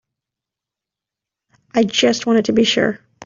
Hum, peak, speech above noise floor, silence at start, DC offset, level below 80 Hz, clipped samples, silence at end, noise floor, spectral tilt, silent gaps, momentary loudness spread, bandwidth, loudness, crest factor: none; -4 dBFS; 70 dB; 1.75 s; under 0.1%; -58 dBFS; under 0.1%; 0 s; -86 dBFS; -4 dB/octave; none; 6 LU; 7.6 kHz; -16 LUFS; 16 dB